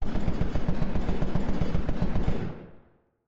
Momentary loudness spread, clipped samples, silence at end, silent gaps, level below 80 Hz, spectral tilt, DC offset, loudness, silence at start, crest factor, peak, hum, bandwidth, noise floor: 6 LU; under 0.1%; 0.5 s; none; -32 dBFS; -8.5 dB/octave; under 0.1%; -31 LUFS; 0 s; 10 dB; -14 dBFS; none; 6.2 kHz; -59 dBFS